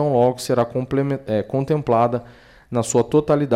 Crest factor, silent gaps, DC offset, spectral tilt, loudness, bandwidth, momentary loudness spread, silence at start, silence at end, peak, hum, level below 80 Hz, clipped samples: 14 dB; none; under 0.1%; -6.5 dB/octave; -20 LUFS; 15.5 kHz; 6 LU; 0 s; 0 s; -6 dBFS; none; -50 dBFS; under 0.1%